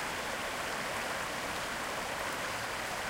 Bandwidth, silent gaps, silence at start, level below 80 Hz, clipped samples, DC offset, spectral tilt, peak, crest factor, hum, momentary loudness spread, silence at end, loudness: 16 kHz; none; 0 s; -58 dBFS; under 0.1%; under 0.1%; -2 dB/octave; -22 dBFS; 14 dB; none; 1 LU; 0 s; -35 LUFS